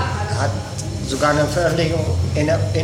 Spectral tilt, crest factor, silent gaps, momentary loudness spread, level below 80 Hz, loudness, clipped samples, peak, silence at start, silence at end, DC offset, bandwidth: -5.5 dB/octave; 16 dB; none; 8 LU; -34 dBFS; -20 LUFS; under 0.1%; -4 dBFS; 0 s; 0 s; under 0.1%; 15.5 kHz